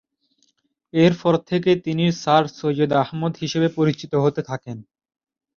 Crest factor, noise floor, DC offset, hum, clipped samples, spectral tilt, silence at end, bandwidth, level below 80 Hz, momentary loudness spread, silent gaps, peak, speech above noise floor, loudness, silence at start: 18 dB; -67 dBFS; under 0.1%; none; under 0.1%; -6.5 dB/octave; 0.75 s; 7.2 kHz; -60 dBFS; 11 LU; none; -2 dBFS; 47 dB; -20 LUFS; 0.95 s